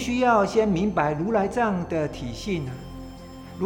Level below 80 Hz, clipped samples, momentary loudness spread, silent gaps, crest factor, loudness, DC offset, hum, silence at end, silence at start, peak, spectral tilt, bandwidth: -44 dBFS; under 0.1%; 20 LU; none; 16 dB; -24 LUFS; under 0.1%; none; 0 s; 0 s; -8 dBFS; -6.5 dB/octave; 19 kHz